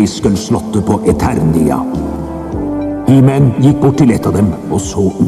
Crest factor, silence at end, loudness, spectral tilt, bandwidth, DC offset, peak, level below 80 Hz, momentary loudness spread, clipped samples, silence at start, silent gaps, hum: 10 dB; 0 s; -12 LUFS; -7.5 dB/octave; 13.5 kHz; under 0.1%; 0 dBFS; -32 dBFS; 9 LU; under 0.1%; 0 s; none; none